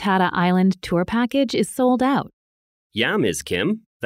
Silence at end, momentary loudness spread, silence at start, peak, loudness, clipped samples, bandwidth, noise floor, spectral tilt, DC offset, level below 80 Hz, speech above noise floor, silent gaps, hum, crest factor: 0 s; 6 LU; 0 s; -4 dBFS; -20 LUFS; under 0.1%; 15.5 kHz; under -90 dBFS; -5.5 dB/octave; under 0.1%; -52 dBFS; over 70 dB; 2.33-2.90 s, 3.86-4.00 s; none; 16 dB